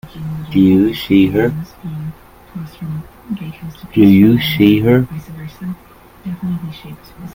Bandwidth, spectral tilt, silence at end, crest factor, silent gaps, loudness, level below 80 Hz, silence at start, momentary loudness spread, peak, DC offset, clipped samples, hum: 17 kHz; -8 dB/octave; 0 s; 16 dB; none; -13 LUFS; -42 dBFS; 0.05 s; 21 LU; 0 dBFS; under 0.1%; under 0.1%; none